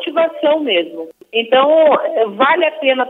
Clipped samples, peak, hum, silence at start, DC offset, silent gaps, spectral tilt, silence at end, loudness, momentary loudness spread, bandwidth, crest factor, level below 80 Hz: under 0.1%; 0 dBFS; none; 0 s; under 0.1%; none; -5.5 dB/octave; 0 s; -14 LUFS; 9 LU; 4 kHz; 14 dB; -76 dBFS